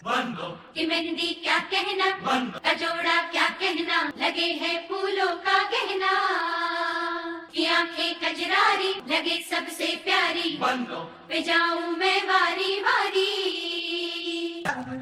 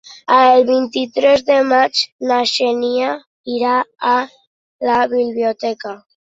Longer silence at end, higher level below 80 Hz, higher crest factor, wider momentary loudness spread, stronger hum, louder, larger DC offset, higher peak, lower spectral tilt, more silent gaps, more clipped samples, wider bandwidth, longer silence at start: second, 0 s vs 0.4 s; second, -72 dBFS vs -62 dBFS; about the same, 16 dB vs 14 dB; second, 7 LU vs 12 LU; neither; second, -25 LUFS vs -15 LUFS; neither; second, -10 dBFS vs -2 dBFS; about the same, -2.5 dB/octave vs -3 dB/octave; second, none vs 2.12-2.19 s, 3.26-3.44 s, 4.47-4.79 s; neither; first, 15.5 kHz vs 8 kHz; about the same, 0 s vs 0.1 s